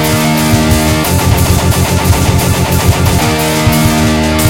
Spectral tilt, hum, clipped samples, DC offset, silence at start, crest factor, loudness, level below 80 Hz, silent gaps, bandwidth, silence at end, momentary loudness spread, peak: -5 dB/octave; none; 0.1%; under 0.1%; 0 s; 10 dB; -10 LUFS; -22 dBFS; none; 17.5 kHz; 0 s; 1 LU; 0 dBFS